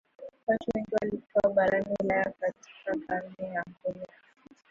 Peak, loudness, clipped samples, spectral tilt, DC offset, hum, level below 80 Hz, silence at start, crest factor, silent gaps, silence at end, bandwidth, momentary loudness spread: -14 dBFS; -30 LUFS; under 0.1%; -7 dB/octave; under 0.1%; none; -62 dBFS; 0.2 s; 18 dB; 0.43-0.47 s; 0.65 s; 7.4 kHz; 11 LU